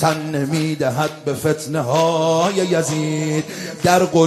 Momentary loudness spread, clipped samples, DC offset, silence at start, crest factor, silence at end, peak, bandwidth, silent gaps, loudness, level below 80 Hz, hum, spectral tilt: 6 LU; under 0.1%; under 0.1%; 0 s; 16 dB; 0 s; -2 dBFS; 15 kHz; none; -19 LUFS; -54 dBFS; none; -5 dB/octave